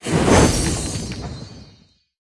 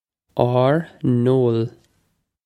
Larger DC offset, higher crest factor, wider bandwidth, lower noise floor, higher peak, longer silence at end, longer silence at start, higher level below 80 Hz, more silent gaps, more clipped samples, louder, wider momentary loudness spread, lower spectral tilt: neither; about the same, 20 dB vs 20 dB; first, 12 kHz vs 8.6 kHz; second, -52 dBFS vs -68 dBFS; about the same, 0 dBFS vs 0 dBFS; second, 0.6 s vs 0.75 s; second, 0.05 s vs 0.35 s; first, -30 dBFS vs -56 dBFS; neither; neither; about the same, -18 LUFS vs -20 LUFS; first, 21 LU vs 9 LU; second, -4.5 dB/octave vs -9.5 dB/octave